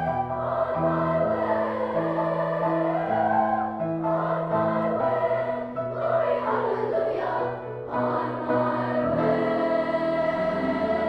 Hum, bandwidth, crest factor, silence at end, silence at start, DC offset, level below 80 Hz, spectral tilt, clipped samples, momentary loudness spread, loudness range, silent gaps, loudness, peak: none; 5.8 kHz; 14 dB; 0 s; 0 s; under 0.1%; -56 dBFS; -9 dB/octave; under 0.1%; 4 LU; 1 LU; none; -25 LUFS; -12 dBFS